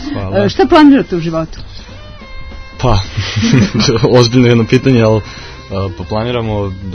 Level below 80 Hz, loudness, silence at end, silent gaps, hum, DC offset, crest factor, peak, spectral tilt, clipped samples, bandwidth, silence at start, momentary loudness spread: -28 dBFS; -11 LUFS; 0 s; none; none; under 0.1%; 12 dB; 0 dBFS; -6 dB/octave; 0.7%; 7 kHz; 0 s; 23 LU